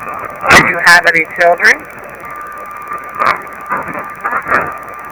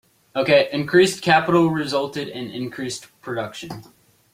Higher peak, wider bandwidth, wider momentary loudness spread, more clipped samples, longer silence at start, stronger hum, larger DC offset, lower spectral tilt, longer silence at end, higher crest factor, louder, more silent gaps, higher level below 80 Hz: about the same, 0 dBFS vs -2 dBFS; first, over 20 kHz vs 16 kHz; first, 20 LU vs 15 LU; first, 2% vs under 0.1%; second, 0 s vs 0.35 s; neither; neither; second, -2.5 dB/octave vs -5 dB/octave; second, 0 s vs 0.5 s; second, 12 dB vs 20 dB; first, -10 LUFS vs -20 LUFS; neither; first, -44 dBFS vs -60 dBFS